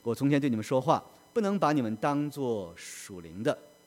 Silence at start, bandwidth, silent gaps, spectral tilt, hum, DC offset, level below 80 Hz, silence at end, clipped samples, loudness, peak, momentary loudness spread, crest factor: 0.05 s; 16 kHz; none; -6.5 dB/octave; none; under 0.1%; -70 dBFS; 0.3 s; under 0.1%; -29 LUFS; -10 dBFS; 14 LU; 20 dB